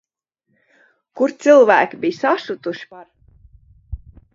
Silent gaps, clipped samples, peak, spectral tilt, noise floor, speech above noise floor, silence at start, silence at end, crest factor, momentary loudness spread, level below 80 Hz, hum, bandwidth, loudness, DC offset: none; under 0.1%; 0 dBFS; -5 dB/octave; -72 dBFS; 56 dB; 1.15 s; 0.4 s; 18 dB; 26 LU; -44 dBFS; none; 7.6 kHz; -16 LUFS; under 0.1%